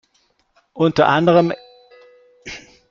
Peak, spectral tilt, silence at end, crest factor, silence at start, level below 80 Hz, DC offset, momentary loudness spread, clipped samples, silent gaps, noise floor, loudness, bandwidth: -2 dBFS; -7 dB/octave; 0.35 s; 18 dB; 0.75 s; -56 dBFS; under 0.1%; 22 LU; under 0.1%; none; -63 dBFS; -16 LUFS; 7.4 kHz